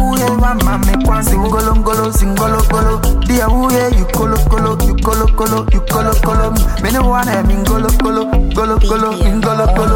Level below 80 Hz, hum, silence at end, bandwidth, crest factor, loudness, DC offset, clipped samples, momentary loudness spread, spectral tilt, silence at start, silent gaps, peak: -14 dBFS; none; 0 s; 17 kHz; 10 dB; -13 LUFS; under 0.1%; under 0.1%; 2 LU; -5.5 dB/octave; 0 s; none; 0 dBFS